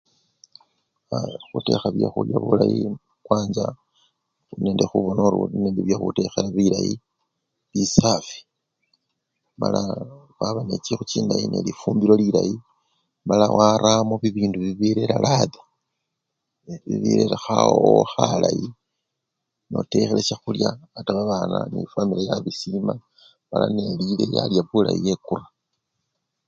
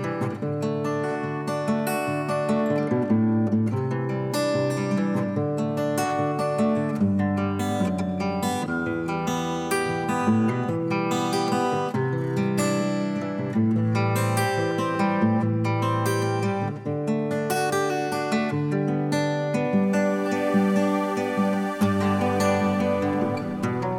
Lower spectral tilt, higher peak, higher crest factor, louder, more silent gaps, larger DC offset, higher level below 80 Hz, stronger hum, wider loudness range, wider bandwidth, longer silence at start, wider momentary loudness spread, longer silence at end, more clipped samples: about the same, -6 dB/octave vs -6.5 dB/octave; first, 0 dBFS vs -10 dBFS; first, 22 dB vs 14 dB; about the same, -22 LUFS vs -24 LUFS; neither; neither; first, -54 dBFS vs -64 dBFS; neither; first, 5 LU vs 2 LU; second, 7.6 kHz vs 17 kHz; first, 1.1 s vs 0 s; first, 12 LU vs 5 LU; first, 1.05 s vs 0 s; neither